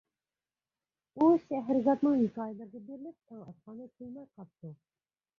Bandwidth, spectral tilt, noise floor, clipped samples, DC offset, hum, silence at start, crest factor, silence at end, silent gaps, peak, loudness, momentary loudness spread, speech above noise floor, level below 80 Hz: 6.4 kHz; -9.5 dB/octave; under -90 dBFS; under 0.1%; under 0.1%; none; 1.15 s; 20 dB; 0.65 s; none; -14 dBFS; -29 LUFS; 24 LU; over 58 dB; -74 dBFS